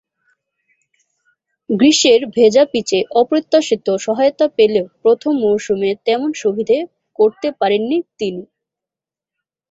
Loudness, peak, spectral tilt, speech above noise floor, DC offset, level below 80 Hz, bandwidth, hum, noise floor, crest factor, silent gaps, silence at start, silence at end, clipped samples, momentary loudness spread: -15 LUFS; 0 dBFS; -4 dB/octave; 73 dB; under 0.1%; -60 dBFS; 8 kHz; none; -88 dBFS; 16 dB; none; 1.7 s; 1.3 s; under 0.1%; 8 LU